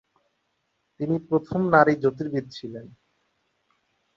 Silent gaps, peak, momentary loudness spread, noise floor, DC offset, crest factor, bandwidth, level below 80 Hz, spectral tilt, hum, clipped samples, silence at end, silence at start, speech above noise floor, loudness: none; -2 dBFS; 19 LU; -74 dBFS; under 0.1%; 24 dB; 7.4 kHz; -62 dBFS; -8 dB/octave; none; under 0.1%; 1.3 s; 1 s; 51 dB; -23 LUFS